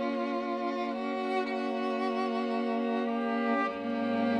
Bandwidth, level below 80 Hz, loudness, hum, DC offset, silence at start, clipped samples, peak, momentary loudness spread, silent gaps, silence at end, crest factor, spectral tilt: 8.8 kHz; -78 dBFS; -31 LUFS; none; under 0.1%; 0 s; under 0.1%; -18 dBFS; 3 LU; none; 0 s; 12 dB; -6 dB/octave